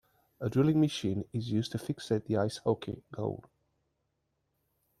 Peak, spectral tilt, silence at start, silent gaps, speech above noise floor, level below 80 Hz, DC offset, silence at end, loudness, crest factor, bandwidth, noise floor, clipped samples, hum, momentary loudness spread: -14 dBFS; -7 dB/octave; 0.4 s; none; 49 dB; -66 dBFS; under 0.1%; 1.6 s; -32 LUFS; 18 dB; 13.5 kHz; -80 dBFS; under 0.1%; none; 11 LU